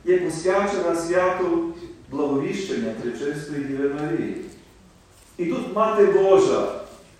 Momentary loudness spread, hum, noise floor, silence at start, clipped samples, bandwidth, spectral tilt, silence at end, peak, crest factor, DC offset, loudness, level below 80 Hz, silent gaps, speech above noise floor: 14 LU; none; -51 dBFS; 0.05 s; under 0.1%; 12 kHz; -5.5 dB/octave; 0.25 s; -4 dBFS; 18 dB; under 0.1%; -22 LUFS; -54 dBFS; none; 30 dB